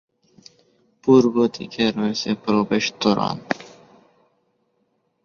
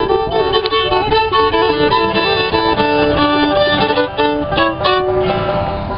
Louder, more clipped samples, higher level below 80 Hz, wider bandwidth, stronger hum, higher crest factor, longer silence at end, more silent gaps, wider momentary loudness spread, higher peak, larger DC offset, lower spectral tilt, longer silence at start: second, -20 LUFS vs -14 LUFS; neither; second, -60 dBFS vs -34 dBFS; first, 7.2 kHz vs 5.6 kHz; neither; first, 20 dB vs 14 dB; first, 1.55 s vs 0 s; neither; first, 12 LU vs 3 LU; about the same, -2 dBFS vs 0 dBFS; second, under 0.1% vs 0.4%; first, -5.5 dB/octave vs -2.5 dB/octave; first, 1.05 s vs 0 s